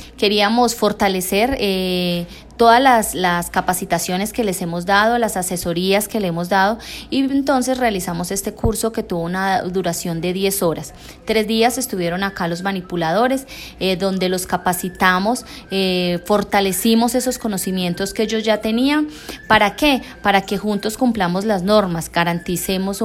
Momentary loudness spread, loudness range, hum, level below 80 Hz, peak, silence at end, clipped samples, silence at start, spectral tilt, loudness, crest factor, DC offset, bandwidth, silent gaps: 7 LU; 4 LU; none; -42 dBFS; 0 dBFS; 0 s; under 0.1%; 0 s; -4 dB/octave; -18 LUFS; 18 dB; under 0.1%; 16.5 kHz; none